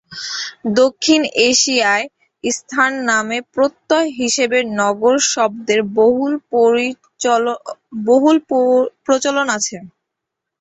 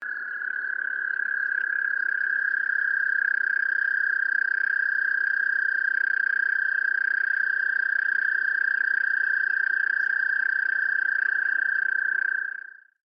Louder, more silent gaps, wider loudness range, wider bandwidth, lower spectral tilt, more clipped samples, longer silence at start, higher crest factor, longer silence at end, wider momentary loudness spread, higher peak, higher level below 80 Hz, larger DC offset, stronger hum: first, -16 LUFS vs -23 LUFS; neither; about the same, 1 LU vs 1 LU; first, 8.4 kHz vs 5.4 kHz; about the same, -2 dB/octave vs -2 dB/octave; neither; about the same, 0.1 s vs 0 s; about the same, 16 dB vs 12 dB; first, 0.7 s vs 0.35 s; first, 10 LU vs 4 LU; first, 0 dBFS vs -12 dBFS; first, -60 dBFS vs under -90 dBFS; neither; neither